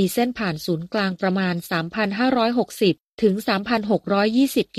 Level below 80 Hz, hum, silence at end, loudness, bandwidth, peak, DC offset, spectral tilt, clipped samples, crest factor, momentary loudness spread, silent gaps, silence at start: -56 dBFS; none; 0 s; -22 LUFS; 15 kHz; -6 dBFS; under 0.1%; -5.5 dB/octave; under 0.1%; 16 dB; 5 LU; 3.06-3.18 s; 0 s